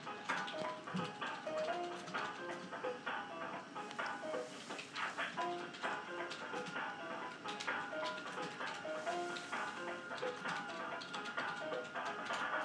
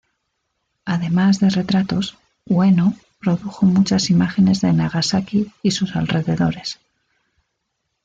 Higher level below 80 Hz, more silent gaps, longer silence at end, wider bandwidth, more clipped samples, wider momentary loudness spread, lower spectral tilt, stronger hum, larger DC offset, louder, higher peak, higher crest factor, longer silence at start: second, under -90 dBFS vs -52 dBFS; neither; second, 0 s vs 1.3 s; first, 13 kHz vs 7.8 kHz; neither; second, 5 LU vs 9 LU; second, -3.5 dB/octave vs -6 dB/octave; neither; neither; second, -43 LUFS vs -18 LUFS; second, -24 dBFS vs -4 dBFS; first, 20 dB vs 14 dB; second, 0 s vs 0.85 s